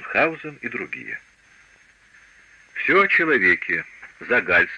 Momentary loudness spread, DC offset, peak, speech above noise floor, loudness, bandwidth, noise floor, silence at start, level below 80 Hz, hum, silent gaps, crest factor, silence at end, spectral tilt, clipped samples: 19 LU; under 0.1%; -6 dBFS; 34 dB; -20 LUFS; 9.6 kHz; -55 dBFS; 0 s; -58 dBFS; none; none; 16 dB; 0 s; -5.5 dB/octave; under 0.1%